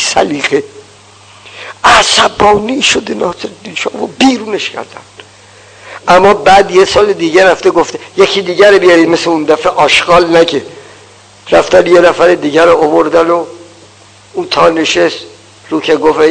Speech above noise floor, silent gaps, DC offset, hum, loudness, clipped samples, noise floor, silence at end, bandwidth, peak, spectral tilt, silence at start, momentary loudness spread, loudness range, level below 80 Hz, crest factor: 31 dB; none; under 0.1%; none; -8 LUFS; 4%; -39 dBFS; 0 s; 11 kHz; 0 dBFS; -3.5 dB/octave; 0 s; 13 LU; 5 LU; -40 dBFS; 10 dB